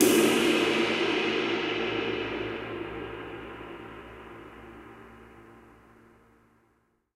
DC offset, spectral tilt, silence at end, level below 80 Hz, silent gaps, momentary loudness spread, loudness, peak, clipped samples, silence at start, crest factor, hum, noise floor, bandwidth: under 0.1%; -3.5 dB/octave; 1.55 s; -58 dBFS; none; 24 LU; -27 LUFS; -4 dBFS; under 0.1%; 0 s; 26 dB; none; -70 dBFS; 16 kHz